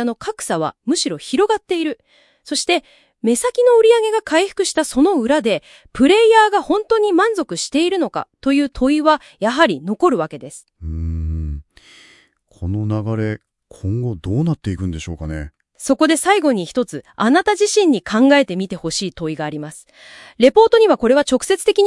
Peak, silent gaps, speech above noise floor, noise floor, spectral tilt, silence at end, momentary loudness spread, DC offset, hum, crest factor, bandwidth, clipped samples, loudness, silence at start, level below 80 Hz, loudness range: 0 dBFS; none; 36 dB; -52 dBFS; -4.5 dB/octave; 0 s; 15 LU; under 0.1%; none; 16 dB; 12 kHz; under 0.1%; -17 LUFS; 0 s; -40 dBFS; 8 LU